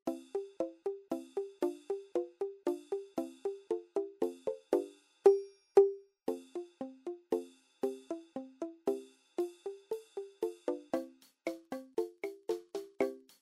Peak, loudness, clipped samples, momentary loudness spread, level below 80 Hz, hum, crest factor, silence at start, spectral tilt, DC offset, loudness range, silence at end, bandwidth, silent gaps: -12 dBFS; -37 LUFS; under 0.1%; 16 LU; -86 dBFS; none; 24 dB; 0.05 s; -5 dB/octave; under 0.1%; 8 LU; 0.2 s; 14.5 kHz; none